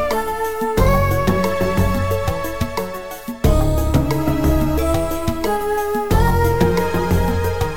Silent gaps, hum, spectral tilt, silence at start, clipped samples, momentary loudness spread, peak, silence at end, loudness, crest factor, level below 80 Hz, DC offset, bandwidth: none; none; -6.5 dB/octave; 0 s; under 0.1%; 7 LU; -2 dBFS; 0 s; -19 LUFS; 16 dB; -24 dBFS; 3%; 17 kHz